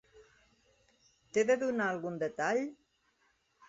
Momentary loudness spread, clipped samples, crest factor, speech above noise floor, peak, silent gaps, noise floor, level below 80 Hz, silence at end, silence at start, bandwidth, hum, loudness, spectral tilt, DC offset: 7 LU; under 0.1%; 18 dB; 42 dB; -18 dBFS; none; -74 dBFS; -76 dBFS; 0.95 s; 0.15 s; 7.6 kHz; none; -33 LUFS; -4 dB/octave; under 0.1%